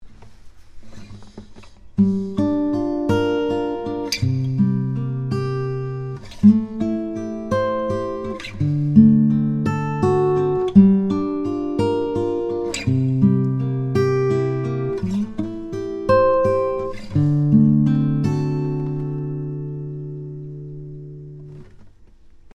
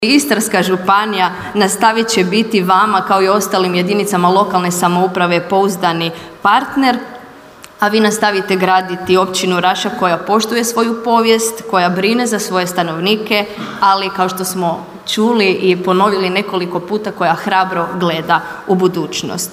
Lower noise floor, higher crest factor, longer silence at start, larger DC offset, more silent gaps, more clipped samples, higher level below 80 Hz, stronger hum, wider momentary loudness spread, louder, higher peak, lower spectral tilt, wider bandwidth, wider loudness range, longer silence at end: first, -45 dBFS vs -37 dBFS; first, 20 dB vs 14 dB; about the same, 0 s vs 0 s; neither; neither; neither; first, -46 dBFS vs -56 dBFS; neither; first, 14 LU vs 6 LU; second, -20 LUFS vs -14 LUFS; about the same, 0 dBFS vs 0 dBFS; first, -8 dB/octave vs -4 dB/octave; second, 10 kHz vs 16 kHz; first, 7 LU vs 2 LU; first, 0.25 s vs 0 s